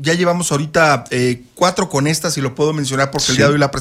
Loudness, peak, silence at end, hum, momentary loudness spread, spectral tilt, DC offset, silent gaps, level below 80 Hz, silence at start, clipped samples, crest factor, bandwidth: -16 LUFS; -2 dBFS; 0 s; none; 5 LU; -4.5 dB/octave; under 0.1%; none; -46 dBFS; 0 s; under 0.1%; 14 dB; 16 kHz